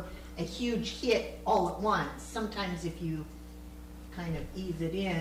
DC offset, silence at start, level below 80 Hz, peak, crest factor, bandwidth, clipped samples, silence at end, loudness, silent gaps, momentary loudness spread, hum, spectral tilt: under 0.1%; 0 s; -48 dBFS; -16 dBFS; 18 dB; 16 kHz; under 0.1%; 0 s; -33 LUFS; none; 17 LU; 60 Hz at -50 dBFS; -5.5 dB/octave